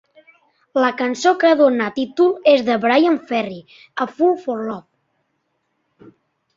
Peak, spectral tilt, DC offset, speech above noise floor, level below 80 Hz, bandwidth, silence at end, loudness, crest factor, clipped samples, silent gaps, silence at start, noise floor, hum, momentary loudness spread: -2 dBFS; -4.5 dB/octave; under 0.1%; 53 dB; -66 dBFS; 7.6 kHz; 1.75 s; -17 LUFS; 16 dB; under 0.1%; none; 0.75 s; -70 dBFS; none; 14 LU